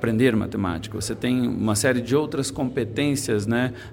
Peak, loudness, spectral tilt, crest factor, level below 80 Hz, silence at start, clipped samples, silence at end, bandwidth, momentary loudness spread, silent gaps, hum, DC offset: -6 dBFS; -23 LUFS; -5 dB/octave; 16 dB; -48 dBFS; 0 s; under 0.1%; 0 s; 17 kHz; 6 LU; none; none; under 0.1%